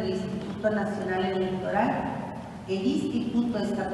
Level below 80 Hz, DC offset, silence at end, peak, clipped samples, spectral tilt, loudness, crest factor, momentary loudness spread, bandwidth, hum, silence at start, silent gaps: -54 dBFS; under 0.1%; 0 s; -10 dBFS; under 0.1%; -6.5 dB/octave; -28 LUFS; 18 dB; 7 LU; 12 kHz; none; 0 s; none